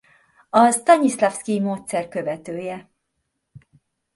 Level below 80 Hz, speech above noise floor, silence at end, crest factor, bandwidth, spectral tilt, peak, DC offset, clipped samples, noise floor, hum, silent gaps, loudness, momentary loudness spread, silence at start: -68 dBFS; 56 dB; 0.6 s; 20 dB; 12 kHz; -4.5 dB/octave; -2 dBFS; under 0.1%; under 0.1%; -76 dBFS; none; none; -20 LUFS; 14 LU; 0.55 s